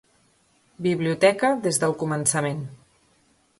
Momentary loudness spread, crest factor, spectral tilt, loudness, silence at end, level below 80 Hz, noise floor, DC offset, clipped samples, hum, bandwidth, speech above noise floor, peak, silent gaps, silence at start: 10 LU; 20 dB; -4.5 dB/octave; -23 LUFS; 0.85 s; -64 dBFS; -63 dBFS; under 0.1%; under 0.1%; none; 12 kHz; 40 dB; -4 dBFS; none; 0.8 s